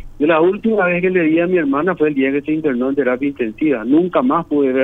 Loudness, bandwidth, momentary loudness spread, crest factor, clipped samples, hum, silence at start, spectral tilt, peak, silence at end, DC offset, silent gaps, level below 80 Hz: -16 LUFS; 3.9 kHz; 4 LU; 14 dB; under 0.1%; none; 0 s; -9 dB/octave; -2 dBFS; 0 s; under 0.1%; none; -46 dBFS